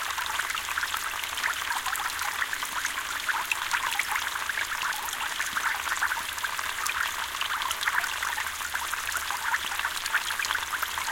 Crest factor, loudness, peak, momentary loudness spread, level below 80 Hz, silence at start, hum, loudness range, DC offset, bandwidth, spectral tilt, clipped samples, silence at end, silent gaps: 20 dB; -28 LUFS; -10 dBFS; 3 LU; -58 dBFS; 0 s; none; 1 LU; under 0.1%; 17 kHz; 1 dB/octave; under 0.1%; 0 s; none